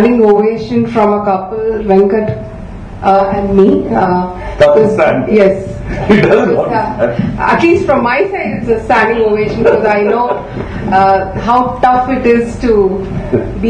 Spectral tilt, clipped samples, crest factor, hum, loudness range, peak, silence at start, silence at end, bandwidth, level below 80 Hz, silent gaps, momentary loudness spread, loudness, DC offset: -7.5 dB/octave; 0.5%; 10 dB; none; 2 LU; 0 dBFS; 0 s; 0 s; 9.8 kHz; -30 dBFS; none; 8 LU; -11 LUFS; under 0.1%